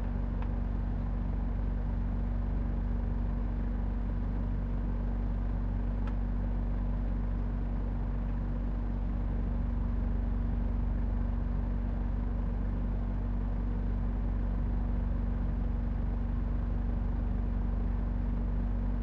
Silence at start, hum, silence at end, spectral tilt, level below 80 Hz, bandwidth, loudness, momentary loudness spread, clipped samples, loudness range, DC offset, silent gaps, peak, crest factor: 0 s; none; 0 s; -10.5 dB/octave; -32 dBFS; 3.3 kHz; -35 LUFS; 1 LU; under 0.1%; 1 LU; under 0.1%; none; -22 dBFS; 10 dB